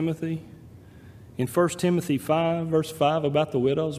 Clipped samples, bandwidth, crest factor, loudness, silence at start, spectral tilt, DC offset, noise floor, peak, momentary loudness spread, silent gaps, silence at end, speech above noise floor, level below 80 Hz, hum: under 0.1%; 15.5 kHz; 18 dB; -25 LUFS; 0 s; -6.5 dB/octave; under 0.1%; -47 dBFS; -8 dBFS; 9 LU; none; 0 s; 23 dB; -60 dBFS; none